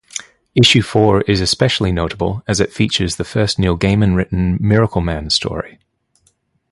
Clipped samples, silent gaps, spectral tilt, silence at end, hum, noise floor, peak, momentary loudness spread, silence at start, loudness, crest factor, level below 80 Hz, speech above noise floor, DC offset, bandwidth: under 0.1%; none; -5 dB/octave; 1.05 s; none; -61 dBFS; 0 dBFS; 9 LU; 0.15 s; -15 LUFS; 16 dB; -32 dBFS; 46 dB; under 0.1%; 11.5 kHz